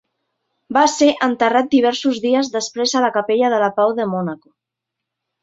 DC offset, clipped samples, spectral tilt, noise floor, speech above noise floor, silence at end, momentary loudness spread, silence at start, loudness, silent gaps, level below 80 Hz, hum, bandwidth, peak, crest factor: under 0.1%; under 0.1%; -4 dB/octave; -82 dBFS; 65 dB; 1.05 s; 7 LU; 0.7 s; -17 LUFS; none; -64 dBFS; none; 7.8 kHz; -2 dBFS; 16 dB